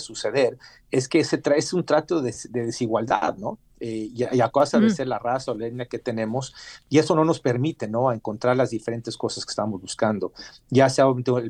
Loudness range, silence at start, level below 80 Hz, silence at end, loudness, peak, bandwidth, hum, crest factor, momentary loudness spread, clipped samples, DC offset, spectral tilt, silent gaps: 1 LU; 0 s; -60 dBFS; 0 s; -23 LUFS; -6 dBFS; 11.5 kHz; none; 18 dB; 11 LU; under 0.1%; under 0.1%; -5.5 dB/octave; none